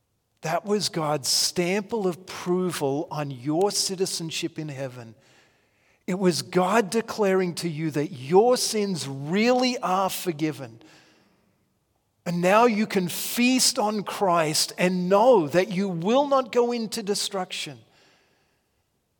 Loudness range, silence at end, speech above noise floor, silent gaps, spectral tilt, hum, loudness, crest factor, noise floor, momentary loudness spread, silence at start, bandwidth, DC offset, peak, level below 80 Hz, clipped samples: 6 LU; 1.45 s; 48 dB; none; -4 dB/octave; none; -24 LUFS; 20 dB; -72 dBFS; 12 LU; 0.45 s; 18 kHz; under 0.1%; -6 dBFS; -72 dBFS; under 0.1%